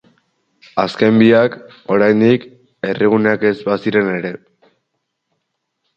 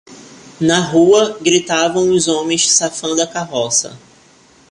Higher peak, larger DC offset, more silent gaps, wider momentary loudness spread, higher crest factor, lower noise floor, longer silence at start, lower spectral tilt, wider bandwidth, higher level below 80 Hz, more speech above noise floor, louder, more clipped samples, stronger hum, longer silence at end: about the same, 0 dBFS vs 0 dBFS; neither; neither; first, 13 LU vs 7 LU; about the same, 16 dB vs 16 dB; first, -73 dBFS vs -48 dBFS; first, 0.75 s vs 0.1 s; first, -8 dB/octave vs -3 dB/octave; second, 7.2 kHz vs 11.5 kHz; about the same, -58 dBFS vs -56 dBFS; first, 59 dB vs 34 dB; about the same, -15 LUFS vs -14 LUFS; neither; neither; first, 1.6 s vs 0.75 s